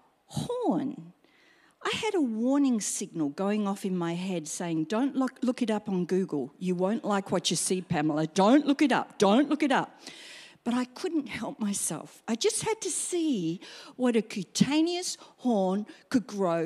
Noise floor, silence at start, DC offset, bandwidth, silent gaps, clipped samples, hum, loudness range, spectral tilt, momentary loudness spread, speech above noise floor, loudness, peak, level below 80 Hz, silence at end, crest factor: -62 dBFS; 0.3 s; under 0.1%; 14.5 kHz; none; under 0.1%; none; 5 LU; -4.5 dB/octave; 10 LU; 34 dB; -28 LUFS; -10 dBFS; -70 dBFS; 0 s; 20 dB